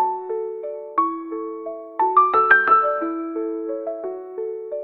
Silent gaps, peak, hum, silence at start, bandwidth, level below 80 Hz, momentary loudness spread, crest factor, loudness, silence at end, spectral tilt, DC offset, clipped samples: none; 0 dBFS; none; 0 s; 4.9 kHz; -72 dBFS; 16 LU; 20 dB; -21 LUFS; 0 s; -6.5 dB/octave; under 0.1%; under 0.1%